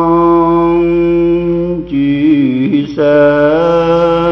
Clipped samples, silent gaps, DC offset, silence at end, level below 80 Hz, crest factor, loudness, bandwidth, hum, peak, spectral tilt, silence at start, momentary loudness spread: under 0.1%; none; under 0.1%; 0 s; -36 dBFS; 10 dB; -10 LUFS; 6.2 kHz; none; 0 dBFS; -9 dB/octave; 0 s; 5 LU